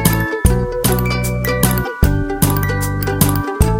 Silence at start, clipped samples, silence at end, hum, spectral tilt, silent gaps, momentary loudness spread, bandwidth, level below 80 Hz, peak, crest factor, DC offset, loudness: 0 s; under 0.1%; 0 s; none; -5 dB/octave; none; 3 LU; 17 kHz; -22 dBFS; 0 dBFS; 16 dB; under 0.1%; -16 LUFS